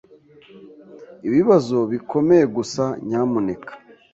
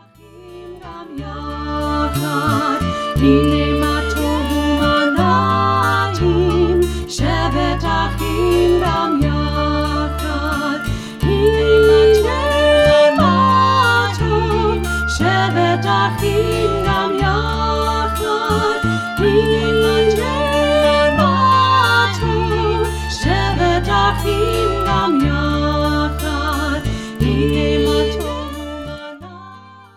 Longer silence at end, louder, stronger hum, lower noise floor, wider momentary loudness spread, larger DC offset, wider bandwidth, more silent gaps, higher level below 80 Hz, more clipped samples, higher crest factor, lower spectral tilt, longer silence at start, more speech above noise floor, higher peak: about the same, 0.35 s vs 0.25 s; second, -19 LUFS vs -16 LUFS; neither; first, -49 dBFS vs -41 dBFS; first, 12 LU vs 9 LU; neither; second, 7.8 kHz vs 16 kHz; neither; second, -60 dBFS vs -26 dBFS; neither; about the same, 18 dB vs 14 dB; about the same, -7 dB/octave vs -6 dB/octave; first, 0.55 s vs 0.35 s; first, 30 dB vs 26 dB; about the same, -2 dBFS vs -2 dBFS